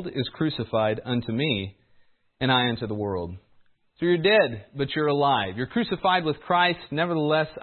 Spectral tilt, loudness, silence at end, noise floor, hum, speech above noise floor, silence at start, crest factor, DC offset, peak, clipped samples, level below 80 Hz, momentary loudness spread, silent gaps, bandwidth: -10.5 dB/octave; -24 LUFS; 0 s; -59 dBFS; none; 35 dB; 0 s; 18 dB; under 0.1%; -6 dBFS; under 0.1%; -58 dBFS; 8 LU; none; 4.5 kHz